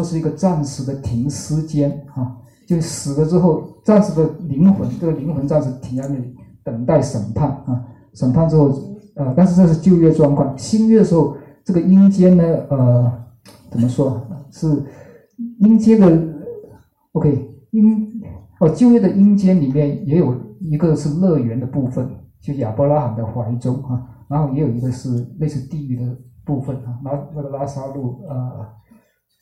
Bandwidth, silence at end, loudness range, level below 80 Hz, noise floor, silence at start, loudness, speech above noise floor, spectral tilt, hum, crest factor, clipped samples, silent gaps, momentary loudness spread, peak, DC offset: 11 kHz; 0.75 s; 8 LU; -46 dBFS; -53 dBFS; 0 s; -17 LUFS; 38 dB; -8.5 dB/octave; none; 16 dB; under 0.1%; none; 15 LU; -2 dBFS; under 0.1%